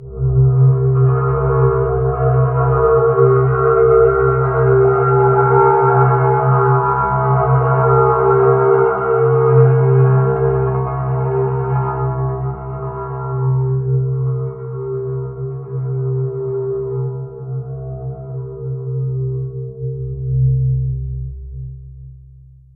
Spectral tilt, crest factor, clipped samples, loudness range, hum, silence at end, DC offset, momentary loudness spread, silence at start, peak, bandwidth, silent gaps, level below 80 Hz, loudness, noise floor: -15 dB/octave; 14 dB; under 0.1%; 11 LU; none; 0.6 s; under 0.1%; 14 LU; 0 s; 0 dBFS; 2.6 kHz; none; -32 dBFS; -15 LUFS; -42 dBFS